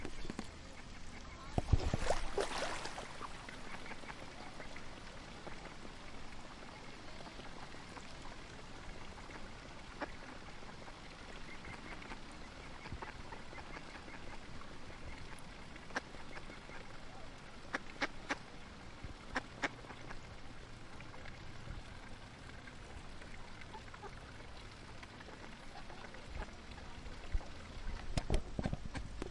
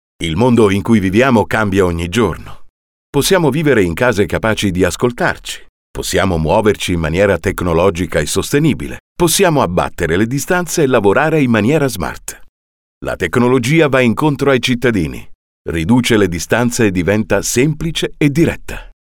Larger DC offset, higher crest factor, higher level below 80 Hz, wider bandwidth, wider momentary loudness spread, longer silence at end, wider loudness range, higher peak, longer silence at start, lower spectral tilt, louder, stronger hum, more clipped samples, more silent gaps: neither; first, 28 dB vs 14 dB; second, -50 dBFS vs -34 dBFS; second, 11.5 kHz vs 18.5 kHz; about the same, 12 LU vs 11 LU; second, 0 s vs 0.3 s; first, 11 LU vs 2 LU; second, -16 dBFS vs 0 dBFS; second, 0 s vs 0.2 s; about the same, -4.5 dB/octave vs -5 dB/octave; second, -47 LUFS vs -14 LUFS; neither; neither; second, none vs 2.70-3.13 s, 5.69-5.94 s, 9.00-9.16 s, 12.49-13.01 s, 15.35-15.65 s